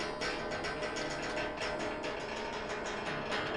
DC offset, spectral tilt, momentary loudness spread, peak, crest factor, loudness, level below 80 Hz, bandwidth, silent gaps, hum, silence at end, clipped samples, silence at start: under 0.1%; -3.5 dB/octave; 2 LU; -24 dBFS; 14 dB; -37 LUFS; -56 dBFS; 11.5 kHz; none; none; 0 s; under 0.1%; 0 s